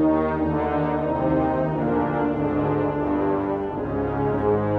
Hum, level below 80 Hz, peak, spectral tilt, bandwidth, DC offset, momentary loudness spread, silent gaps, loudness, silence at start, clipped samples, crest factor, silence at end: none; -40 dBFS; -10 dBFS; -10.5 dB/octave; 4.6 kHz; under 0.1%; 4 LU; none; -23 LUFS; 0 s; under 0.1%; 12 dB; 0 s